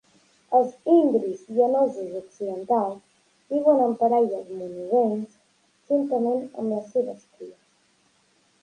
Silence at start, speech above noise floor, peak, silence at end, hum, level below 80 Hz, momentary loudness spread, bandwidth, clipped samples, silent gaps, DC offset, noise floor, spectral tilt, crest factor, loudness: 0.5 s; 41 dB; -6 dBFS; 1.1 s; none; -76 dBFS; 15 LU; 9.8 kHz; under 0.1%; none; under 0.1%; -64 dBFS; -8 dB/octave; 18 dB; -24 LUFS